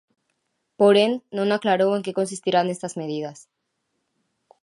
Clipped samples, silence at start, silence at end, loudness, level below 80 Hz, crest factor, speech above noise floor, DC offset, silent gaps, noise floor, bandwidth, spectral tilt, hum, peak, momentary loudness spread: under 0.1%; 0.8 s; 1.3 s; -22 LUFS; -76 dBFS; 18 dB; 54 dB; under 0.1%; none; -76 dBFS; 11.5 kHz; -5 dB/octave; none; -4 dBFS; 13 LU